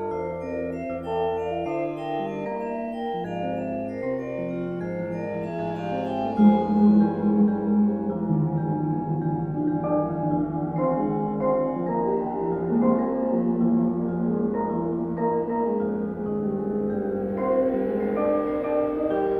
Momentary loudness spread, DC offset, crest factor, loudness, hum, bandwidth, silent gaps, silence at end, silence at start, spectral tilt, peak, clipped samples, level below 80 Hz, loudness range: 8 LU; under 0.1%; 18 dB; -25 LUFS; none; 4.4 kHz; none; 0 s; 0 s; -10.5 dB/octave; -6 dBFS; under 0.1%; -54 dBFS; 7 LU